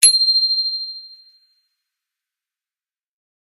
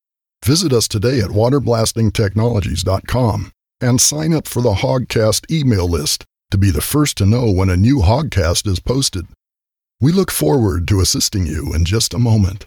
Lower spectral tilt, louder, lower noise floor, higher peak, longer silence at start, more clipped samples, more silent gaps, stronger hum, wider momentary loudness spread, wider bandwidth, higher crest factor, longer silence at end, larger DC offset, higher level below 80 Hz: second, 7 dB/octave vs -5 dB/octave; about the same, -14 LUFS vs -16 LUFS; about the same, under -90 dBFS vs -88 dBFS; about the same, 0 dBFS vs -2 dBFS; second, 0 s vs 0.4 s; neither; neither; neither; first, 18 LU vs 5 LU; second, 17 kHz vs over 20 kHz; first, 22 dB vs 14 dB; first, 2.35 s vs 0.05 s; neither; second, -76 dBFS vs -30 dBFS